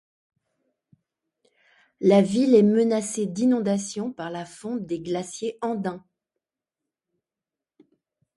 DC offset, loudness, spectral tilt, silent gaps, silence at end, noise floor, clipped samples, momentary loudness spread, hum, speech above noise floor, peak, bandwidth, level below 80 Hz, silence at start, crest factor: under 0.1%; -23 LUFS; -6 dB/octave; none; 2.4 s; -89 dBFS; under 0.1%; 15 LU; none; 67 dB; -6 dBFS; 11.5 kHz; -68 dBFS; 2 s; 20 dB